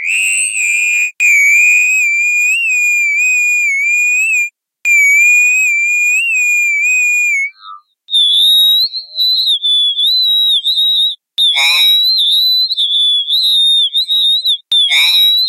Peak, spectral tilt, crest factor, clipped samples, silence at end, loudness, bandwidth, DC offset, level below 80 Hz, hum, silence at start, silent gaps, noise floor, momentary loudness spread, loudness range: -2 dBFS; 5.5 dB/octave; 10 dB; under 0.1%; 0 s; -8 LUFS; 16 kHz; under 0.1%; -62 dBFS; none; 0 s; none; -35 dBFS; 5 LU; 1 LU